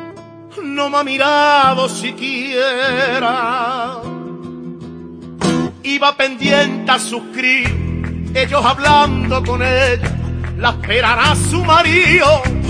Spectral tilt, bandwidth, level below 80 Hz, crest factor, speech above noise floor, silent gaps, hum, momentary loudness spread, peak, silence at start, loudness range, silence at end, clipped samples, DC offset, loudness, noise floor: -4.5 dB/octave; 10.5 kHz; -32 dBFS; 14 dB; 21 dB; none; none; 18 LU; 0 dBFS; 0 s; 5 LU; 0 s; under 0.1%; under 0.1%; -14 LUFS; -35 dBFS